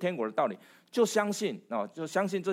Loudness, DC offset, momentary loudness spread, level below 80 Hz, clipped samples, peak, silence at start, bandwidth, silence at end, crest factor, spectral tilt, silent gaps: -31 LUFS; under 0.1%; 8 LU; -88 dBFS; under 0.1%; -12 dBFS; 0 s; 16 kHz; 0 s; 18 dB; -4.5 dB/octave; none